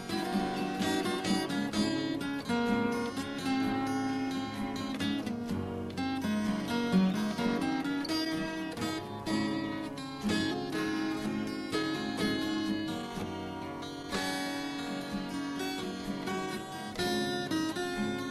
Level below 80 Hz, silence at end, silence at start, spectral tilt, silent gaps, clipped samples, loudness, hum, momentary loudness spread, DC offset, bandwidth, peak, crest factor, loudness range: -58 dBFS; 0 s; 0 s; -5 dB/octave; none; under 0.1%; -33 LUFS; none; 6 LU; under 0.1%; 14.5 kHz; -16 dBFS; 18 dB; 4 LU